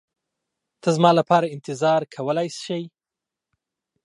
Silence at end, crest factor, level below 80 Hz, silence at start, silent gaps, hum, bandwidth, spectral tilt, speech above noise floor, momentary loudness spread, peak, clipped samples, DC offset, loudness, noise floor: 1.15 s; 22 dB; -76 dBFS; 0.85 s; none; none; 11.5 kHz; -6 dB/octave; 67 dB; 13 LU; -2 dBFS; under 0.1%; under 0.1%; -21 LUFS; -88 dBFS